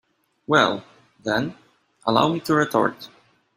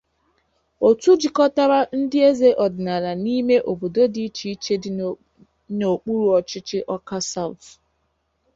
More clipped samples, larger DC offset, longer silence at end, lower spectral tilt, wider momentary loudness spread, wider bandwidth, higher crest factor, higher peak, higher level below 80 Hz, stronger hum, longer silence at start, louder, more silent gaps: neither; neither; second, 0.5 s vs 1 s; about the same, -5 dB/octave vs -5.5 dB/octave; first, 18 LU vs 12 LU; first, 15.5 kHz vs 7.8 kHz; first, 22 dB vs 16 dB; about the same, -2 dBFS vs -4 dBFS; about the same, -62 dBFS vs -60 dBFS; neither; second, 0.5 s vs 0.8 s; about the same, -22 LUFS vs -20 LUFS; neither